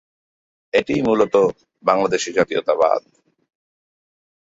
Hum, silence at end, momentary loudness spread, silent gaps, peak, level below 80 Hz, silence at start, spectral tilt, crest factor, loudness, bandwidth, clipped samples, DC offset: none; 1.4 s; 5 LU; none; -2 dBFS; -56 dBFS; 0.75 s; -4.5 dB/octave; 18 dB; -19 LUFS; 8 kHz; under 0.1%; under 0.1%